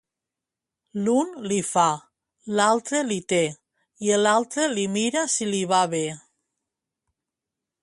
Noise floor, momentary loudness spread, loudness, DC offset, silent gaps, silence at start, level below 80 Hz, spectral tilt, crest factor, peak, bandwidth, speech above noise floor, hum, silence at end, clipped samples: -87 dBFS; 8 LU; -23 LUFS; under 0.1%; none; 0.95 s; -70 dBFS; -3.5 dB/octave; 20 dB; -6 dBFS; 11.5 kHz; 65 dB; none; 1.65 s; under 0.1%